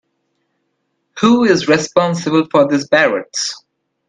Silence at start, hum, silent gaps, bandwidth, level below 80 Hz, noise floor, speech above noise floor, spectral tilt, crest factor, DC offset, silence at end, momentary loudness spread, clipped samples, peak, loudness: 1.15 s; none; none; 9.6 kHz; -58 dBFS; -69 dBFS; 55 dB; -4.5 dB/octave; 16 dB; under 0.1%; 0.5 s; 8 LU; under 0.1%; 0 dBFS; -14 LUFS